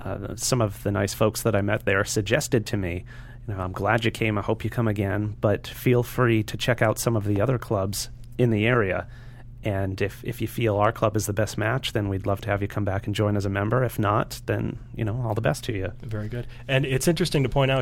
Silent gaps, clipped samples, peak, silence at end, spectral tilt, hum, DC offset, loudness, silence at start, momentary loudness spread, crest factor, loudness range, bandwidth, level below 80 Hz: none; under 0.1%; -6 dBFS; 0 s; -5.5 dB/octave; none; under 0.1%; -25 LUFS; 0 s; 9 LU; 20 dB; 2 LU; 17 kHz; -44 dBFS